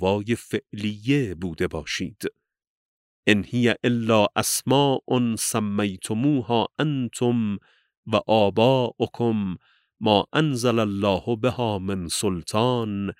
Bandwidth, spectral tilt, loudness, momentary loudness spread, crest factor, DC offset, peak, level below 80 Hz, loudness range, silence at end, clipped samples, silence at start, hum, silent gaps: 16 kHz; -5 dB/octave; -23 LUFS; 8 LU; 22 dB; under 0.1%; -2 dBFS; -54 dBFS; 3 LU; 0.05 s; under 0.1%; 0 s; none; 2.67-3.23 s, 7.97-8.03 s